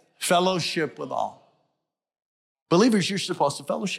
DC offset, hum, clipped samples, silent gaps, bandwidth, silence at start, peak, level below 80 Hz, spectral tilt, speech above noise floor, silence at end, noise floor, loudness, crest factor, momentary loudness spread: under 0.1%; none; under 0.1%; 2.22-2.55 s, 2.62-2.66 s; 16 kHz; 0.2 s; -10 dBFS; -72 dBFS; -4.5 dB/octave; 56 dB; 0 s; -80 dBFS; -24 LUFS; 16 dB; 10 LU